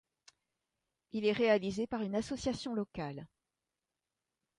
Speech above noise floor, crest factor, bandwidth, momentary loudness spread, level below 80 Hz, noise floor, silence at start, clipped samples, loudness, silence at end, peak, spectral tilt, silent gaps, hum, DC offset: 56 dB; 22 dB; 11 kHz; 13 LU; -64 dBFS; -90 dBFS; 1.15 s; under 0.1%; -35 LUFS; 1.3 s; -16 dBFS; -5.5 dB/octave; none; none; under 0.1%